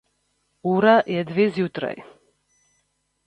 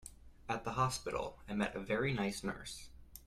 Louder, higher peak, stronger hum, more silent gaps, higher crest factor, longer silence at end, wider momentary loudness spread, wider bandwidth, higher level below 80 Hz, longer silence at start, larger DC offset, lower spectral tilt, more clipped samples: first, -21 LUFS vs -38 LUFS; first, -4 dBFS vs -20 dBFS; first, 50 Hz at -60 dBFS vs none; neither; about the same, 20 dB vs 18 dB; first, 1.25 s vs 0 s; about the same, 14 LU vs 16 LU; second, 8.6 kHz vs 15 kHz; second, -66 dBFS vs -58 dBFS; first, 0.65 s vs 0 s; neither; first, -7.5 dB/octave vs -5 dB/octave; neither